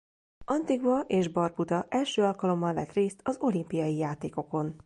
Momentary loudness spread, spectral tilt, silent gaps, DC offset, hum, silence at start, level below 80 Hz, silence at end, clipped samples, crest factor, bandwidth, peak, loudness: 6 LU; -6.5 dB/octave; none; under 0.1%; none; 0.4 s; -64 dBFS; 0.1 s; under 0.1%; 14 dB; 11.5 kHz; -14 dBFS; -29 LUFS